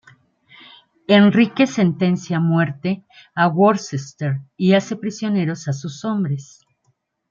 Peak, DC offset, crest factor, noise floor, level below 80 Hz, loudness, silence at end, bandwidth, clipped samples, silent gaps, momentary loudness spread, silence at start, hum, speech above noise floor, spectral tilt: -2 dBFS; under 0.1%; 16 dB; -67 dBFS; -64 dBFS; -19 LUFS; 0.9 s; 7.4 kHz; under 0.1%; none; 12 LU; 1.1 s; none; 49 dB; -6.5 dB/octave